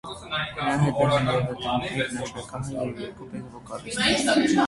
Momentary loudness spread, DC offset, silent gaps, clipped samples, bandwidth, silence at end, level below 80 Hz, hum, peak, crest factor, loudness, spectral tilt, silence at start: 16 LU; under 0.1%; none; under 0.1%; 11.5 kHz; 0 s; -50 dBFS; none; -8 dBFS; 18 dB; -25 LUFS; -5 dB/octave; 0.05 s